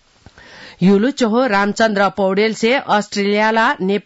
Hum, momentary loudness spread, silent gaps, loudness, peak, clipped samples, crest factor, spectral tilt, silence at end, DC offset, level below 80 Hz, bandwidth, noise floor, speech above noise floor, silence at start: none; 3 LU; none; -15 LUFS; -4 dBFS; under 0.1%; 12 dB; -5.5 dB/octave; 0.05 s; under 0.1%; -56 dBFS; 8 kHz; -45 dBFS; 30 dB; 0.55 s